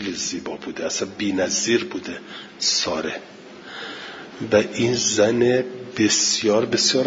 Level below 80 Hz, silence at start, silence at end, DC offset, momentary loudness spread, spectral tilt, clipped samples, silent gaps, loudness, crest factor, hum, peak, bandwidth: -62 dBFS; 0 s; 0 s; under 0.1%; 17 LU; -2.5 dB/octave; under 0.1%; none; -21 LUFS; 20 dB; none; -2 dBFS; 7.8 kHz